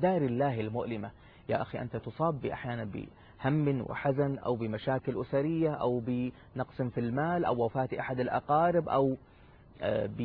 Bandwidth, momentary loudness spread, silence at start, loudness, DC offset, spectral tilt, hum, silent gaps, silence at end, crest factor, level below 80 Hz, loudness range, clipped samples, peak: 4.9 kHz; 10 LU; 0 s; -32 LUFS; under 0.1%; -11 dB/octave; none; none; 0 s; 16 dB; -58 dBFS; 4 LU; under 0.1%; -16 dBFS